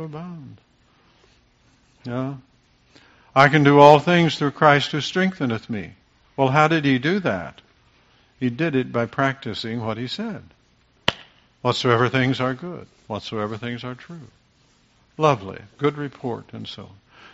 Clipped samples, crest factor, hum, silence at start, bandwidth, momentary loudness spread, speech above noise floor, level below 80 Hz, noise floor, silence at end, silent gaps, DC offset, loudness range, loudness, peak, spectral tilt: under 0.1%; 22 dB; none; 0 s; 8 kHz; 22 LU; 39 dB; -58 dBFS; -60 dBFS; 0.5 s; none; under 0.1%; 10 LU; -20 LUFS; 0 dBFS; -4.5 dB/octave